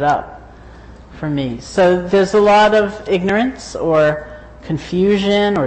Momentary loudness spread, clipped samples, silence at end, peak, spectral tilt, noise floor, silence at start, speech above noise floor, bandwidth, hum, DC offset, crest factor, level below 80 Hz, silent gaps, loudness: 15 LU; under 0.1%; 0 s; -4 dBFS; -6 dB/octave; -38 dBFS; 0 s; 23 dB; 8.8 kHz; none; under 0.1%; 12 dB; -40 dBFS; none; -15 LUFS